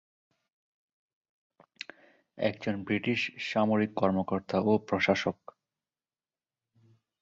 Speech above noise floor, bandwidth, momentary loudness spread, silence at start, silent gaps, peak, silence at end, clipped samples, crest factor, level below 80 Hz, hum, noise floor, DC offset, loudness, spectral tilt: over 61 dB; 7.6 kHz; 18 LU; 2.35 s; none; -10 dBFS; 1.9 s; under 0.1%; 22 dB; -64 dBFS; none; under -90 dBFS; under 0.1%; -29 LUFS; -6.5 dB/octave